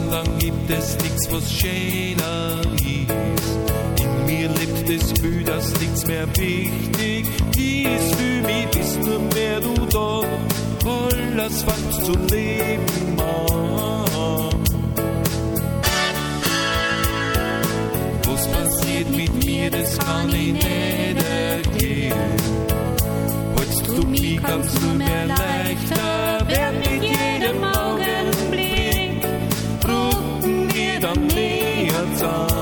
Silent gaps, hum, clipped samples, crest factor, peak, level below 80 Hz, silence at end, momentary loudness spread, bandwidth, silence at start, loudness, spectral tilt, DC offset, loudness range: none; none; under 0.1%; 18 dB; -4 dBFS; -30 dBFS; 0 s; 3 LU; 17.5 kHz; 0 s; -20 LUFS; -4.5 dB/octave; under 0.1%; 1 LU